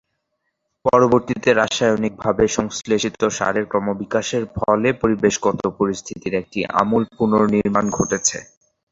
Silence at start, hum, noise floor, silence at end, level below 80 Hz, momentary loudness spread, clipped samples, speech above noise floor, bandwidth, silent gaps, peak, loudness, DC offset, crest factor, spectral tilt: 0.85 s; none; -74 dBFS; 0.5 s; -48 dBFS; 7 LU; under 0.1%; 56 dB; 8 kHz; none; 0 dBFS; -19 LUFS; under 0.1%; 18 dB; -4.5 dB/octave